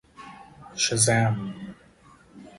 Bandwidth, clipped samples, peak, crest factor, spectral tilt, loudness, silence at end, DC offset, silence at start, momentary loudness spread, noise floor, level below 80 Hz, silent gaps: 11.5 kHz; under 0.1%; -6 dBFS; 22 dB; -3.5 dB/octave; -23 LUFS; 0.1 s; under 0.1%; 0.2 s; 25 LU; -54 dBFS; -58 dBFS; none